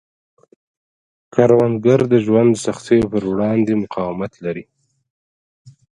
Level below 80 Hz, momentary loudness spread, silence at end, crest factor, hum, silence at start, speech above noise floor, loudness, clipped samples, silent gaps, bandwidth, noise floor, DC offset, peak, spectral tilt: -52 dBFS; 12 LU; 0.25 s; 18 dB; none; 1.35 s; over 74 dB; -17 LUFS; under 0.1%; 5.10-5.65 s; 11 kHz; under -90 dBFS; under 0.1%; 0 dBFS; -7.5 dB/octave